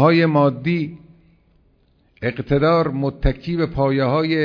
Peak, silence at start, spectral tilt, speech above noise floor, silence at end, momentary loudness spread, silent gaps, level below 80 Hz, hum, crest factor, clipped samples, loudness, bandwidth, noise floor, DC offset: -2 dBFS; 0 s; -9.5 dB/octave; 41 dB; 0 s; 10 LU; none; -34 dBFS; none; 18 dB; under 0.1%; -19 LUFS; 5.4 kHz; -58 dBFS; under 0.1%